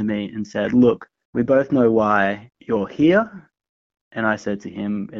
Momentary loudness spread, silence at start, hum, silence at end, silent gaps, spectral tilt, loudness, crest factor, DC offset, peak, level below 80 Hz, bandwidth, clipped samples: 12 LU; 0 s; none; 0 s; 1.25-1.33 s, 3.69-3.90 s, 4.01-4.11 s; -5.5 dB/octave; -20 LUFS; 16 dB; under 0.1%; -4 dBFS; -56 dBFS; 7.4 kHz; under 0.1%